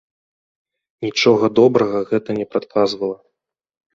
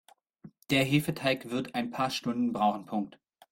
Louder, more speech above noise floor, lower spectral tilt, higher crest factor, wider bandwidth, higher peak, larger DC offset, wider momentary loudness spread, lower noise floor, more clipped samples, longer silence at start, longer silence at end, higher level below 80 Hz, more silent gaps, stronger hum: first, -17 LUFS vs -30 LUFS; first, 61 dB vs 25 dB; about the same, -5.5 dB/octave vs -5.5 dB/octave; about the same, 18 dB vs 18 dB; second, 7.6 kHz vs 16.5 kHz; first, -2 dBFS vs -12 dBFS; neither; first, 12 LU vs 9 LU; first, -78 dBFS vs -55 dBFS; neither; first, 1 s vs 0.45 s; first, 0.8 s vs 0.4 s; first, -58 dBFS vs -66 dBFS; neither; neither